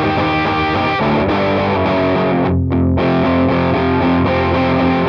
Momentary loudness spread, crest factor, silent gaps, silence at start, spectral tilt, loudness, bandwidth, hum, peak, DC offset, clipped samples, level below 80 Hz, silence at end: 1 LU; 10 dB; none; 0 s; -8.5 dB/octave; -15 LUFS; 6.6 kHz; none; -4 dBFS; under 0.1%; under 0.1%; -34 dBFS; 0 s